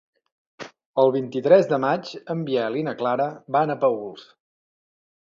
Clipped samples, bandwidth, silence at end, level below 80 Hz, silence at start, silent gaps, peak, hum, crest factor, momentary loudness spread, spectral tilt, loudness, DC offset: under 0.1%; 7.2 kHz; 1 s; -72 dBFS; 0.6 s; 0.86-0.94 s; -4 dBFS; none; 20 dB; 15 LU; -7 dB/octave; -22 LUFS; under 0.1%